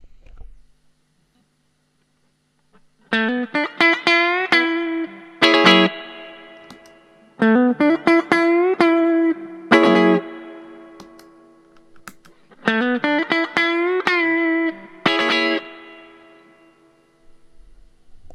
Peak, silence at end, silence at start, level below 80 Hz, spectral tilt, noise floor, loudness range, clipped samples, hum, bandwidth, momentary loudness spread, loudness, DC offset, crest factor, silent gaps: 0 dBFS; 0.05 s; 0.35 s; -56 dBFS; -5 dB/octave; -65 dBFS; 8 LU; under 0.1%; none; 11.5 kHz; 15 LU; -17 LUFS; under 0.1%; 20 dB; none